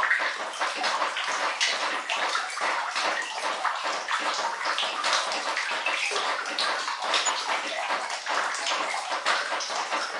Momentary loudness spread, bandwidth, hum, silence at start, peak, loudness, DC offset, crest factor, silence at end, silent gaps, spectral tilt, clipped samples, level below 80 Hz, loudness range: 4 LU; 11.5 kHz; none; 0 s; -10 dBFS; -27 LUFS; under 0.1%; 18 dB; 0 s; none; 1.5 dB/octave; under 0.1%; under -90 dBFS; 1 LU